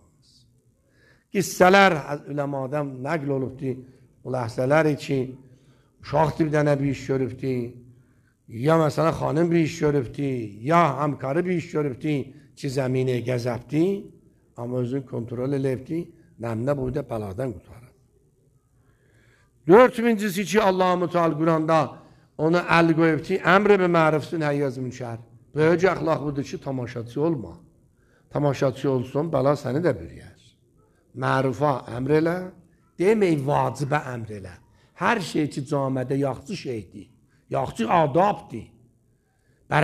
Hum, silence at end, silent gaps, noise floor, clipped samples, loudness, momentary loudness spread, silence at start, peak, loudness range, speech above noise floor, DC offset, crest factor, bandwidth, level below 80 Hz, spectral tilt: none; 0 s; none; -64 dBFS; under 0.1%; -23 LUFS; 14 LU; 1.35 s; 0 dBFS; 7 LU; 42 dB; under 0.1%; 24 dB; 14.5 kHz; -56 dBFS; -6.5 dB/octave